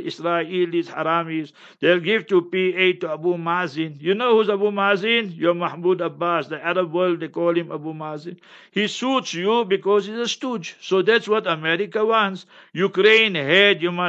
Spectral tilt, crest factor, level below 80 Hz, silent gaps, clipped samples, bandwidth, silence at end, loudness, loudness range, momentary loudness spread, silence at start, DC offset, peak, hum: -5 dB/octave; 20 dB; -78 dBFS; none; under 0.1%; 8 kHz; 0 s; -20 LUFS; 4 LU; 12 LU; 0 s; under 0.1%; -2 dBFS; none